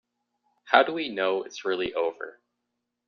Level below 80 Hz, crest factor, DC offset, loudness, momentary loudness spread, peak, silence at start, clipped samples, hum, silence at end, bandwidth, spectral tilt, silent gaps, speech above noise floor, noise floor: -70 dBFS; 24 dB; under 0.1%; -26 LUFS; 12 LU; -4 dBFS; 0.65 s; under 0.1%; 60 Hz at -60 dBFS; 0.75 s; 7 kHz; -0.5 dB/octave; none; 56 dB; -82 dBFS